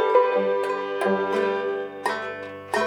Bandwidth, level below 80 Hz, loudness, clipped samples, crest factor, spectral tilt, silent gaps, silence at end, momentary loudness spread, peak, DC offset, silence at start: 17 kHz; -78 dBFS; -24 LUFS; under 0.1%; 18 dB; -5 dB/octave; none; 0 s; 9 LU; -6 dBFS; under 0.1%; 0 s